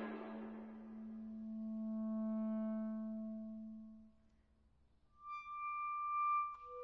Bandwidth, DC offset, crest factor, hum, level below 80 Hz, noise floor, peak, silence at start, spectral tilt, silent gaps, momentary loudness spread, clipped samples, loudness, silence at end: 5 kHz; under 0.1%; 14 dB; none; -76 dBFS; -73 dBFS; -32 dBFS; 0 s; -7 dB/octave; none; 14 LU; under 0.1%; -44 LUFS; 0 s